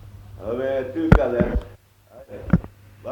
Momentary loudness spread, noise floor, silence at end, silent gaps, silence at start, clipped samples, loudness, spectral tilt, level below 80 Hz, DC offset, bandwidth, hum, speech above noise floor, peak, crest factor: 21 LU; -48 dBFS; 0 s; none; 0.05 s; under 0.1%; -22 LUFS; -9 dB/octave; -30 dBFS; under 0.1%; 18 kHz; none; 28 dB; 0 dBFS; 22 dB